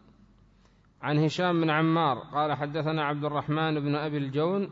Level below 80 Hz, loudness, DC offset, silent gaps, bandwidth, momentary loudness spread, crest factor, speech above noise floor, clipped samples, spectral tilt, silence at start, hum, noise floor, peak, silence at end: -64 dBFS; -28 LUFS; under 0.1%; none; 7.8 kHz; 5 LU; 16 dB; 34 dB; under 0.1%; -7 dB/octave; 1 s; none; -61 dBFS; -12 dBFS; 0 s